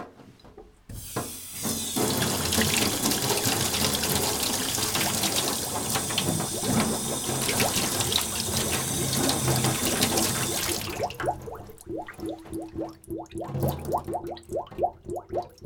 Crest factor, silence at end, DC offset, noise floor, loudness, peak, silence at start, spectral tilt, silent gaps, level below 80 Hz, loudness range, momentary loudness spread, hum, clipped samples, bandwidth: 24 dB; 0 s; under 0.1%; -50 dBFS; -26 LUFS; -4 dBFS; 0 s; -3 dB/octave; none; -50 dBFS; 9 LU; 13 LU; none; under 0.1%; over 20 kHz